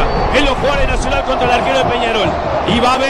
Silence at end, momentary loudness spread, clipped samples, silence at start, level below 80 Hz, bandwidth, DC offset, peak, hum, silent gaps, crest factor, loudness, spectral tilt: 0 s; 3 LU; under 0.1%; 0 s; -22 dBFS; 12.5 kHz; under 0.1%; 0 dBFS; none; none; 12 dB; -14 LUFS; -4.5 dB/octave